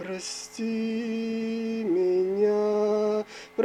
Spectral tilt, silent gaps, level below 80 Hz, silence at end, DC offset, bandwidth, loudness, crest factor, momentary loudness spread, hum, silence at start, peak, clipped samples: -5 dB/octave; none; -70 dBFS; 0 s; under 0.1%; 12 kHz; -27 LUFS; 14 dB; 9 LU; none; 0 s; -12 dBFS; under 0.1%